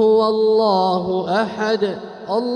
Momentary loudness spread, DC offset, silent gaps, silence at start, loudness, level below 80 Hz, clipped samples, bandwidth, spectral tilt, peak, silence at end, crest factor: 8 LU; under 0.1%; none; 0 s; -18 LUFS; -60 dBFS; under 0.1%; 9.4 kHz; -6.5 dB/octave; -6 dBFS; 0 s; 12 dB